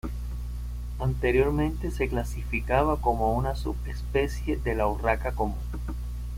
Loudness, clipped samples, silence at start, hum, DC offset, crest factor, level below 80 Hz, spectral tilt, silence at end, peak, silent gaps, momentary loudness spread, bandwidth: -28 LUFS; under 0.1%; 0.05 s; 60 Hz at -30 dBFS; under 0.1%; 18 dB; -32 dBFS; -7 dB/octave; 0 s; -10 dBFS; none; 12 LU; 16 kHz